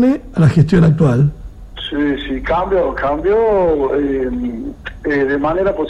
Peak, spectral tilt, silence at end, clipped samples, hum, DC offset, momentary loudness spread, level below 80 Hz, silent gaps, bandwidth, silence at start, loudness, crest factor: 0 dBFS; -8.5 dB/octave; 0 s; under 0.1%; none; under 0.1%; 12 LU; -32 dBFS; none; 9.6 kHz; 0 s; -15 LUFS; 14 dB